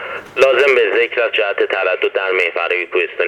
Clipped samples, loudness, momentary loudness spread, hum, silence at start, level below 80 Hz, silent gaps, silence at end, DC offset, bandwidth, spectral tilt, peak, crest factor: under 0.1%; -15 LUFS; 6 LU; none; 0 s; -60 dBFS; none; 0 s; under 0.1%; 12.5 kHz; -3 dB/octave; 0 dBFS; 16 dB